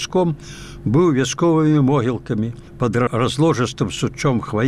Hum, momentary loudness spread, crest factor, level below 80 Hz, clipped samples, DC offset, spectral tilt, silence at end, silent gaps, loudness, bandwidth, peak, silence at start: none; 9 LU; 12 dB; -44 dBFS; under 0.1%; 0.4%; -6 dB/octave; 0 s; none; -19 LUFS; 12.5 kHz; -6 dBFS; 0 s